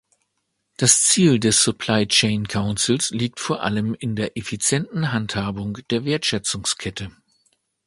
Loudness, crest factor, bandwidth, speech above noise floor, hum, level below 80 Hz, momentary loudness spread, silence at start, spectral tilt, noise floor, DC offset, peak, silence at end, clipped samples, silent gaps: -20 LUFS; 22 dB; 11.5 kHz; 53 dB; none; -50 dBFS; 11 LU; 0.8 s; -3 dB/octave; -74 dBFS; under 0.1%; 0 dBFS; 0.75 s; under 0.1%; none